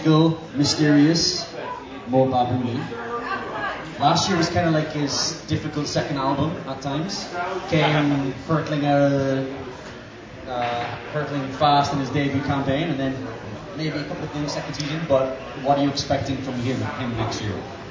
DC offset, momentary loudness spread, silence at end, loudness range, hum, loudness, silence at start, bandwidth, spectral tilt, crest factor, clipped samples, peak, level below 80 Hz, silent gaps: under 0.1%; 12 LU; 0 s; 3 LU; none; -23 LUFS; 0 s; 7.8 kHz; -5 dB/octave; 18 dB; under 0.1%; -4 dBFS; -48 dBFS; none